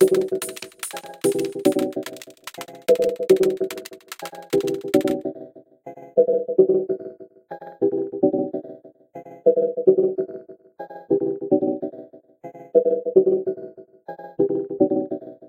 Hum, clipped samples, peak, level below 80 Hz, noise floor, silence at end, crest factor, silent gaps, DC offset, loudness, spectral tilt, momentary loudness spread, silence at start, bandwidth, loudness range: none; under 0.1%; -2 dBFS; -68 dBFS; -43 dBFS; 0 s; 20 dB; none; under 0.1%; -22 LUFS; -5.5 dB/octave; 21 LU; 0 s; 17 kHz; 1 LU